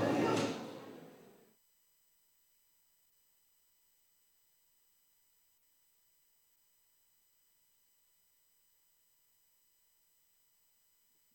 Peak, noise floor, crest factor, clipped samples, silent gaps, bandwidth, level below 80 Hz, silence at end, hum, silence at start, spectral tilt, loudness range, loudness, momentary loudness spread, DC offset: -22 dBFS; -73 dBFS; 24 dB; under 0.1%; none; 17 kHz; -88 dBFS; 10.2 s; none; 0 s; -5.5 dB/octave; 21 LU; -37 LUFS; 30 LU; under 0.1%